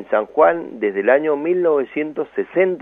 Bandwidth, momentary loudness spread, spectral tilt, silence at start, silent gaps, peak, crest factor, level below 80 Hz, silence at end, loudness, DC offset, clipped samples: 3.8 kHz; 8 LU; -8.5 dB/octave; 0 s; none; -2 dBFS; 16 dB; -64 dBFS; 0 s; -18 LUFS; under 0.1%; under 0.1%